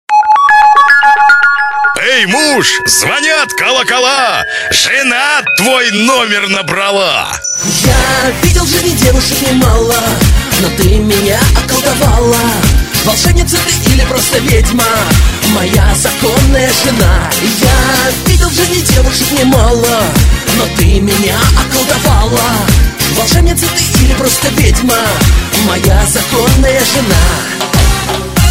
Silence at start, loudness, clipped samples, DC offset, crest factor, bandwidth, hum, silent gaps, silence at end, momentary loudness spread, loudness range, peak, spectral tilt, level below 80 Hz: 0.1 s; -8 LUFS; 0.2%; 0.6%; 8 dB; 16.5 kHz; none; none; 0 s; 3 LU; 1 LU; 0 dBFS; -3.5 dB/octave; -16 dBFS